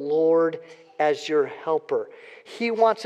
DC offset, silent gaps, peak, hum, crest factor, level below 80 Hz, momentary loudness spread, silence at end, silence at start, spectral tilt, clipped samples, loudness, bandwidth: under 0.1%; none; -6 dBFS; none; 16 dB; under -90 dBFS; 19 LU; 0 s; 0 s; -5 dB/octave; under 0.1%; -24 LUFS; 8.6 kHz